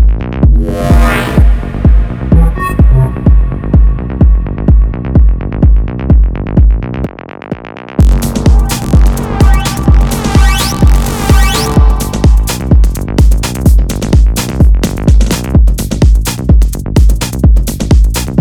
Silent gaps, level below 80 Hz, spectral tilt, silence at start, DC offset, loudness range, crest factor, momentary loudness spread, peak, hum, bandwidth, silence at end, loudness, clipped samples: none; -8 dBFS; -6 dB/octave; 0 s; under 0.1%; 2 LU; 8 dB; 3 LU; 0 dBFS; none; 16.5 kHz; 0 s; -10 LUFS; 2%